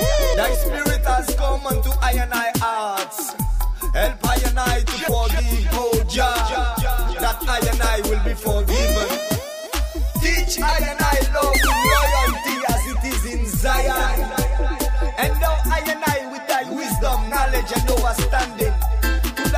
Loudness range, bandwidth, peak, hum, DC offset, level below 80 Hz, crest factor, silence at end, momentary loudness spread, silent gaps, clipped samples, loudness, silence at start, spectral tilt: 3 LU; 16 kHz; -4 dBFS; none; under 0.1%; -22 dBFS; 14 dB; 0 s; 5 LU; none; under 0.1%; -20 LUFS; 0 s; -4 dB/octave